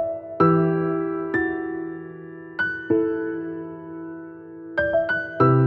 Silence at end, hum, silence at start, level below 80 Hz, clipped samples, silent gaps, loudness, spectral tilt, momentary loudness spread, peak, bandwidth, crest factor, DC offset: 0 s; none; 0 s; -56 dBFS; under 0.1%; none; -23 LUFS; -10.5 dB/octave; 17 LU; -4 dBFS; 5.2 kHz; 18 dB; under 0.1%